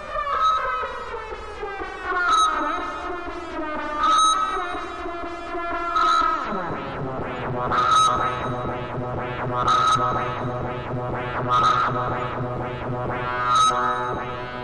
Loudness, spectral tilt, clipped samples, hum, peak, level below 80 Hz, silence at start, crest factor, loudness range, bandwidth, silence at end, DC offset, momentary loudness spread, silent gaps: -23 LUFS; -4 dB/octave; under 0.1%; none; -10 dBFS; -44 dBFS; 0 s; 14 dB; 3 LU; 11 kHz; 0 s; 0.4%; 13 LU; none